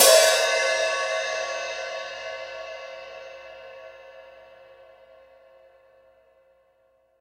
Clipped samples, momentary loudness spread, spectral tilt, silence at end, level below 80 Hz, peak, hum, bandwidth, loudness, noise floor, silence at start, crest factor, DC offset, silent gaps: under 0.1%; 25 LU; 2.5 dB/octave; 2.9 s; -68 dBFS; -2 dBFS; 60 Hz at -70 dBFS; 16 kHz; -23 LUFS; -64 dBFS; 0 s; 24 dB; under 0.1%; none